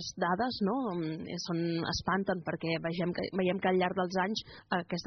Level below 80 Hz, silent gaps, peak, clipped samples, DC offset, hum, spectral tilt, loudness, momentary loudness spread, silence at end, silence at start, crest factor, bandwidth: -60 dBFS; none; -18 dBFS; under 0.1%; under 0.1%; none; -4.5 dB/octave; -33 LUFS; 6 LU; 0 s; 0 s; 16 dB; 6.4 kHz